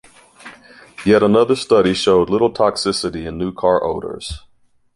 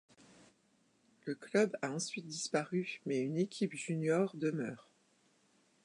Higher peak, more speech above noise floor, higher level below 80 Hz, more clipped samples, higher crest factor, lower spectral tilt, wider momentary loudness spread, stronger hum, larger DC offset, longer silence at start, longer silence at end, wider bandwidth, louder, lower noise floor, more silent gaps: first, -2 dBFS vs -18 dBFS; about the same, 39 dB vs 37 dB; first, -42 dBFS vs -88 dBFS; neither; about the same, 16 dB vs 20 dB; about the same, -5 dB/octave vs -5 dB/octave; about the same, 13 LU vs 11 LU; neither; neither; second, 0.45 s vs 1.25 s; second, 0.6 s vs 1.05 s; about the same, 11.5 kHz vs 11 kHz; first, -16 LUFS vs -37 LUFS; second, -55 dBFS vs -73 dBFS; neither